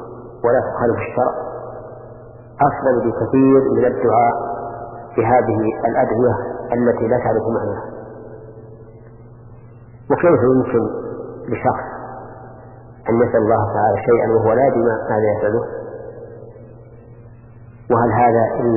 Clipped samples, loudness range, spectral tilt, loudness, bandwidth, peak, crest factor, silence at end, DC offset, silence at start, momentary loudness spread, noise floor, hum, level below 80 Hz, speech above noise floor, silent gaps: under 0.1%; 6 LU; -14.5 dB/octave; -17 LUFS; 2.9 kHz; -2 dBFS; 16 dB; 0 s; under 0.1%; 0 s; 21 LU; -40 dBFS; none; -46 dBFS; 25 dB; none